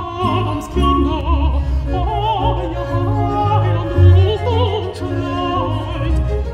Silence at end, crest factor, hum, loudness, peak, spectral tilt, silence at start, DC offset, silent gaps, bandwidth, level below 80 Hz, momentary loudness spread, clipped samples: 0 s; 14 dB; none; -17 LUFS; 0 dBFS; -8 dB/octave; 0 s; under 0.1%; none; 8.6 kHz; -22 dBFS; 8 LU; under 0.1%